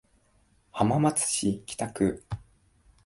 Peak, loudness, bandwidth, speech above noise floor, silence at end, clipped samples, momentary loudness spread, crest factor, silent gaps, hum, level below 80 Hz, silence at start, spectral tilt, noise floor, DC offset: -8 dBFS; -27 LUFS; 12 kHz; 38 dB; 0.65 s; under 0.1%; 17 LU; 22 dB; none; none; -54 dBFS; 0.75 s; -5 dB/octave; -65 dBFS; under 0.1%